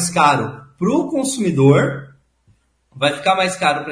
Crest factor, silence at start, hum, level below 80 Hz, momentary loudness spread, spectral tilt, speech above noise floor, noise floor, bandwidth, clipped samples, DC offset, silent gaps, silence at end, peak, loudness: 18 dB; 0 s; none; -54 dBFS; 9 LU; -5 dB/octave; 42 dB; -58 dBFS; 11 kHz; under 0.1%; under 0.1%; none; 0 s; 0 dBFS; -17 LUFS